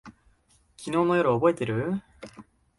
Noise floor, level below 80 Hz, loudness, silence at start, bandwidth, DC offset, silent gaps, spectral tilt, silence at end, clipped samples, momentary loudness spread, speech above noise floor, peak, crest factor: -63 dBFS; -60 dBFS; -25 LUFS; 0.05 s; 11.5 kHz; under 0.1%; none; -7 dB/octave; 0.35 s; under 0.1%; 24 LU; 39 dB; -8 dBFS; 20 dB